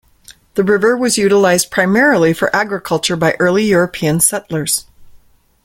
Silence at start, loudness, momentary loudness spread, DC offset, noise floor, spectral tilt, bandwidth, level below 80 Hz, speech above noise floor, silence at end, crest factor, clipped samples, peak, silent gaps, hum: 0.3 s; -13 LUFS; 7 LU; under 0.1%; -47 dBFS; -4 dB/octave; 17 kHz; -50 dBFS; 33 dB; 0.6 s; 14 dB; under 0.1%; 0 dBFS; none; none